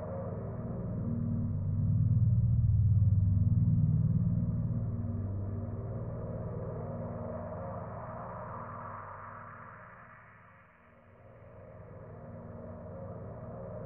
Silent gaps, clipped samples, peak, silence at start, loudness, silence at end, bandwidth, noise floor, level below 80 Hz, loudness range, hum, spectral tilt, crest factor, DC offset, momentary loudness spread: none; under 0.1%; -18 dBFS; 0 s; -33 LUFS; 0 s; 2.5 kHz; -59 dBFS; -44 dBFS; 21 LU; none; -10 dB/octave; 16 dB; under 0.1%; 21 LU